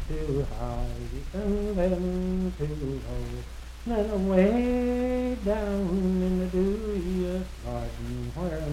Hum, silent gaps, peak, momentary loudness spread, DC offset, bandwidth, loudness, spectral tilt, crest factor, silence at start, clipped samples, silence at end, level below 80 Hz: none; none; -10 dBFS; 11 LU; under 0.1%; 14.5 kHz; -29 LUFS; -8 dB/octave; 18 dB; 0 s; under 0.1%; 0 s; -36 dBFS